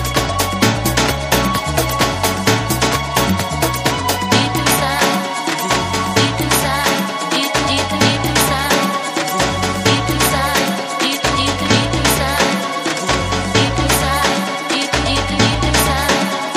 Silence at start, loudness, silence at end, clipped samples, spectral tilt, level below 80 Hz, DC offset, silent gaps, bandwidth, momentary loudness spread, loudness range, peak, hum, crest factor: 0 s; -15 LUFS; 0 s; under 0.1%; -3.5 dB/octave; -30 dBFS; under 0.1%; none; 15.5 kHz; 4 LU; 1 LU; 0 dBFS; none; 16 dB